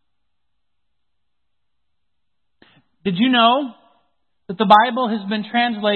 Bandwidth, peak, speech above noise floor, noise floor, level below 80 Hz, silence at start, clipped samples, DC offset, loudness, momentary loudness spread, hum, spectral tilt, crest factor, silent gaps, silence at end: 5.6 kHz; 0 dBFS; 63 dB; -80 dBFS; -66 dBFS; 3.05 s; under 0.1%; under 0.1%; -17 LUFS; 14 LU; none; -7 dB/octave; 20 dB; none; 0 s